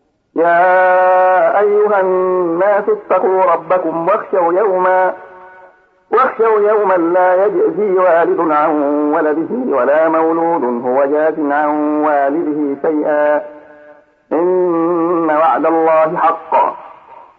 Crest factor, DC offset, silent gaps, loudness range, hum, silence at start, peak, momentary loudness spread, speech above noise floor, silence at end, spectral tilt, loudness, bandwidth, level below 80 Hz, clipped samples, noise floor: 10 dB; under 0.1%; none; 3 LU; none; 0.35 s; -2 dBFS; 5 LU; 33 dB; 0.2 s; -9 dB/octave; -13 LUFS; 4.4 kHz; -68 dBFS; under 0.1%; -45 dBFS